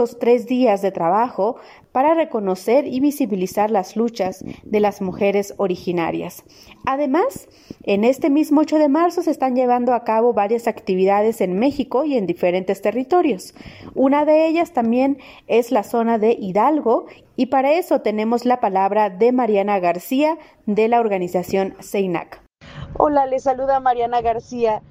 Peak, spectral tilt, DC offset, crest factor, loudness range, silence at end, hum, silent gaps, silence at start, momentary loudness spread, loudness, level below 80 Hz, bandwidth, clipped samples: 0 dBFS; -6.5 dB/octave; under 0.1%; 18 dB; 3 LU; 0.1 s; none; none; 0 s; 7 LU; -19 LUFS; -54 dBFS; 16 kHz; under 0.1%